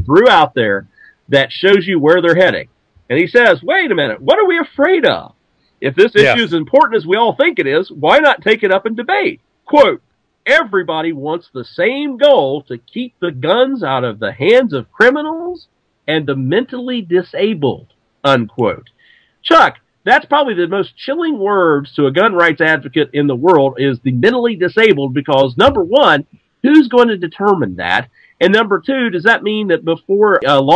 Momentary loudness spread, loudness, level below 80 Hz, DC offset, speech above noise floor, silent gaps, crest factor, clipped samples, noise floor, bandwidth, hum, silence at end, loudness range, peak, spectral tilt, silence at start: 10 LU; -13 LUFS; -50 dBFS; under 0.1%; 38 dB; none; 12 dB; 0.4%; -50 dBFS; 9.4 kHz; none; 0 s; 4 LU; 0 dBFS; -6.5 dB/octave; 0 s